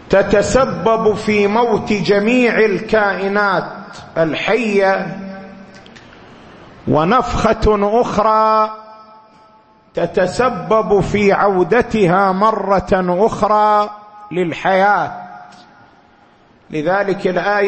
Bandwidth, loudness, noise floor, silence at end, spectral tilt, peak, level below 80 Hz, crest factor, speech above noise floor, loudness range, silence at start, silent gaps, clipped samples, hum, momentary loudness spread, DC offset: 8.8 kHz; -15 LUFS; -49 dBFS; 0 s; -6 dB/octave; 0 dBFS; -36 dBFS; 14 dB; 35 dB; 5 LU; 0.1 s; none; under 0.1%; none; 12 LU; under 0.1%